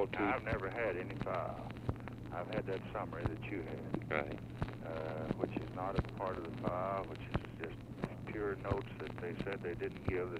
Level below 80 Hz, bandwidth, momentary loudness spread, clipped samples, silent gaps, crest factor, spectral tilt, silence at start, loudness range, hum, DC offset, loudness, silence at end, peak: -54 dBFS; 14.5 kHz; 7 LU; under 0.1%; none; 22 dB; -8 dB/octave; 0 s; 2 LU; none; under 0.1%; -41 LUFS; 0 s; -18 dBFS